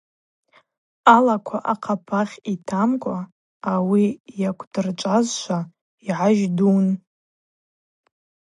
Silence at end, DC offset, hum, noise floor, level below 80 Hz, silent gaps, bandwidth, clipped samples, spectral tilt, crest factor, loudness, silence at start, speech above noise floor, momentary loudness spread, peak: 1.6 s; under 0.1%; none; under -90 dBFS; -70 dBFS; 3.32-3.60 s, 4.20-4.24 s, 4.67-4.71 s, 5.81-5.98 s; 10.5 kHz; under 0.1%; -6 dB/octave; 22 dB; -21 LUFS; 1.05 s; over 70 dB; 13 LU; 0 dBFS